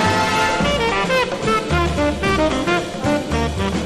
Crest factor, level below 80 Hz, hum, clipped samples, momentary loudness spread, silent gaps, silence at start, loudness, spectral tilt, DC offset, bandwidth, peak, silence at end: 14 dB; -30 dBFS; none; under 0.1%; 4 LU; none; 0 s; -18 LUFS; -5 dB/octave; under 0.1%; 13.5 kHz; -4 dBFS; 0 s